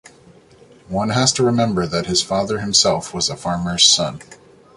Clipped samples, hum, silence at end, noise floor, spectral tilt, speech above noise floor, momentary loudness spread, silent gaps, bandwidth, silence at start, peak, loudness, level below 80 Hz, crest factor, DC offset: under 0.1%; none; 0.4 s; -48 dBFS; -3 dB/octave; 30 dB; 11 LU; none; 11.5 kHz; 0.9 s; 0 dBFS; -17 LUFS; -46 dBFS; 20 dB; under 0.1%